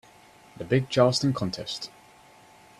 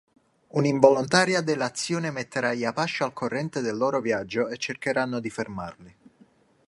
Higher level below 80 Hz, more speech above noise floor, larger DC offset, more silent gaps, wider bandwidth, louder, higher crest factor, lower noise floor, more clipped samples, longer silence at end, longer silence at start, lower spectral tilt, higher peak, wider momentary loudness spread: about the same, -60 dBFS vs -64 dBFS; second, 29 dB vs 34 dB; neither; neither; first, 13 kHz vs 11.5 kHz; about the same, -25 LUFS vs -25 LUFS; about the same, 22 dB vs 24 dB; second, -54 dBFS vs -59 dBFS; neither; about the same, 0.9 s vs 0.8 s; about the same, 0.6 s vs 0.55 s; about the same, -5.5 dB/octave vs -4.5 dB/octave; second, -6 dBFS vs -2 dBFS; first, 17 LU vs 11 LU